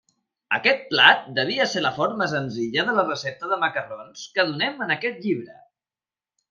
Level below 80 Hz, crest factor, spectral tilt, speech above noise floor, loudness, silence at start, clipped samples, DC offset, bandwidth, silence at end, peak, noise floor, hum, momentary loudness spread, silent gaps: -72 dBFS; 24 dB; -4 dB/octave; over 67 dB; -22 LUFS; 0.5 s; under 0.1%; under 0.1%; 7.6 kHz; 1 s; 0 dBFS; under -90 dBFS; none; 13 LU; none